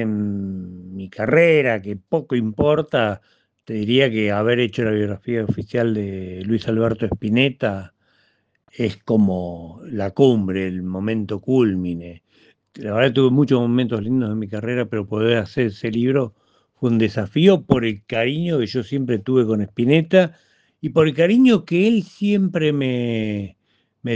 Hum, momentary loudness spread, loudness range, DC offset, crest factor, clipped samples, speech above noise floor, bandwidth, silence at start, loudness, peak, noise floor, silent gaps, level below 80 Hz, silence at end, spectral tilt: none; 12 LU; 4 LU; under 0.1%; 20 dB; under 0.1%; 45 dB; 8 kHz; 0 s; -19 LUFS; 0 dBFS; -64 dBFS; none; -54 dBFS; 0 s; -8 dB/octave